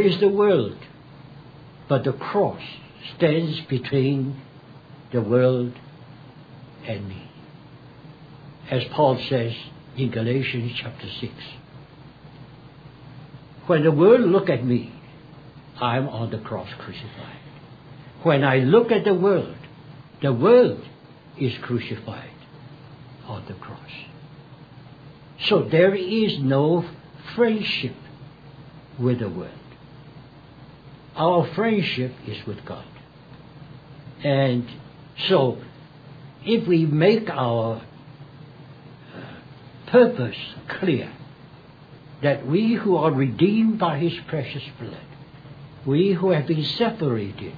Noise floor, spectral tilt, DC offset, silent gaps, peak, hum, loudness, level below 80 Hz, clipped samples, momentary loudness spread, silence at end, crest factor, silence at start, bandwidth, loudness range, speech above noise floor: -46 dBFS; -9 dB/octave; under 0.1%; none; -4 dBFS; none; -22 LUFS; -60 dBFS; under 0.1%; 25 LU; 0 s; 20 dB; 0 s; 5 kHz; 8 LU; 25 dB